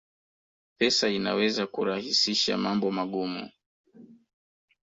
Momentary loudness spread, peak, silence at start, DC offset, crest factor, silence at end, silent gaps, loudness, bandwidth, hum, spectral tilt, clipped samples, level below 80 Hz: 9 LU; -10 dBFS; 0.8 s; under 0.1%; 20 dB; 0.7 s; 3.66-3.84 s; -26 LUFS; 8 kHz; none; -3.5 dB/octave; under 0.1%; -68 dBFS